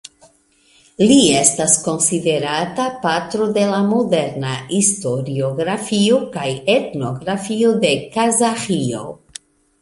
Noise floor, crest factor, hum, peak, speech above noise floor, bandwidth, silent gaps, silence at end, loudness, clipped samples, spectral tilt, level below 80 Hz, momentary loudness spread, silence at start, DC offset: -55 dBFS; 18 dB; none; 0 dBFS; 38 dB; 11.5 kHz; none; 0.65 s; -17 LUFS; under 0.1%; -3.5 dB/octave; -54 dBFS; 11 LU; 1 s; under 0.1%